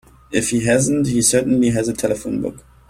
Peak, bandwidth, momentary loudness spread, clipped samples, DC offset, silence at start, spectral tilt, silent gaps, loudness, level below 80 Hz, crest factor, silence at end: -2 dBFS; 16 kHz; 9 LU; under 0.1%; under 0.1%; 0.3 s; -4.5 dB/octave; none; -18 LUFS; -44 dBFS; 16 dB; 0.3 s